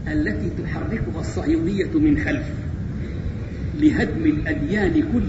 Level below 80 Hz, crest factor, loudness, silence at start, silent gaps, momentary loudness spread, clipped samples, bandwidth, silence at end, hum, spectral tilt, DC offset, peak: -32 dBFS; 16 dB; -22 LUFS; 0 s; none; 10 LU; under 0.1%; 8 kHz; 0 s; none; -8 dB/octave; 0.3%; -6 dBFS